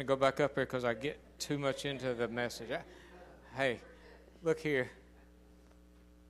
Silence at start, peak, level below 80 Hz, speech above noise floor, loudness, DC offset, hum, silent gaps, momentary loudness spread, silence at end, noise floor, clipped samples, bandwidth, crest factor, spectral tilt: 0 s; -14 dBFS; -62 dBFS; 25 dB; -36 LUFS; under 0.1%; none; none; 22 LU; 1.1 s; -60 dBFS; under 0.1%; 14.5 kHz; 24 dB; -5 dB/octave